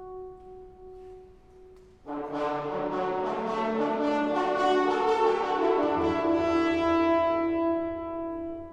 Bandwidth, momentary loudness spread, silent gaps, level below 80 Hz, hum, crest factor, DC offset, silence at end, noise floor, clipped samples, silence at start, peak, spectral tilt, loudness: 8.8 kHz; 19 LU; none; -56 dBFS; none; 16 dB; under 0.1%; 0 s; -52 dBFS; under 0.1%; 0 s; -12 dBFS; -6 dB/octave; -27 LUFS